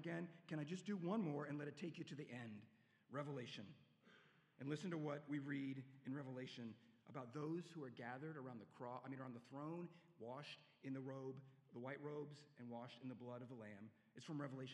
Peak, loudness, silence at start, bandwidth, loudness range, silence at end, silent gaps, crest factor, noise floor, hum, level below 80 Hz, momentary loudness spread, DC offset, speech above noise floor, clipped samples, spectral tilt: -32 dBFS; -52 LUFS; 0 s; 11 kHz; 5 LU; 0 s; none; 20 dB; -73 dBFS; none; under -90 dBFS; 11 LU; under 0.1%; 22 dB; under 0.1%; -7 dB/octave